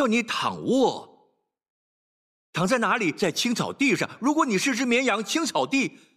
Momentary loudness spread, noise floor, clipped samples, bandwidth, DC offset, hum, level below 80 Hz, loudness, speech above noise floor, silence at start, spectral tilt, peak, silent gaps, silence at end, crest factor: 4 LU; -68 dBFS; under 0.1%; 15 kHz; under 0.1%; none; -70 dBFS; -24 LUFS; 44 dB; 0 s; -4 dB/octave; -10 dBFS; 1.70-2.53 s; 0.25 s; 14 dB